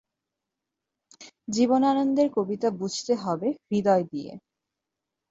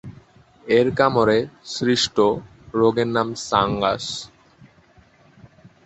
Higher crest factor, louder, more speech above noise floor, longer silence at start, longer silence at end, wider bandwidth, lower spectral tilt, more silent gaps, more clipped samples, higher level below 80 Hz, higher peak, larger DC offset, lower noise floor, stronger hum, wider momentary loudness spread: about the same, 18 dB vs 20 dB; second, -25 LUFS vs -20 LUFS; first, 61 dB vs 34 dB; first, 1.2 s vs 0.05 s; second, 0.9 s vs 1.6 s; about the same, 8 kHz vs 8.2 kHz; about the same, -5.5 dB/octave vs -4.5 dB/octave; neither; neither; second, -70 dBFS vs -52 dBFS; second, -8 dBFS vs -2 dBFS; neither; first, -86 dBFS vs -54 dBFS; neither; about the same, 13 LU vs 12 LU